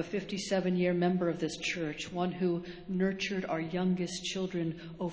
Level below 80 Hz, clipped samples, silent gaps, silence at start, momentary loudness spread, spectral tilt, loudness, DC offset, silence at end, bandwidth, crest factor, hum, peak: -62 dBFS; under 0.1%; none; 0 s; 7 LU; -5.5 dB/octave; -33 LUFS; under 0.1%; 0 s; 8 kHz; 16 dB; none; -18 dBFS